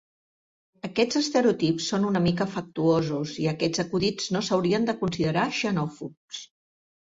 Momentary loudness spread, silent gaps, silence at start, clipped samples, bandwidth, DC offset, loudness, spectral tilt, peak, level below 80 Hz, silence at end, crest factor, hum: 11 LU; 6.17-6.28 s; 0.85 s; under 0.1%; 7.8 kHz; under 0.1%; -25 LUFS; -5.5 dB/octave; -10 dBFS; -58 dBFS; 0.55 s; 16 dB; none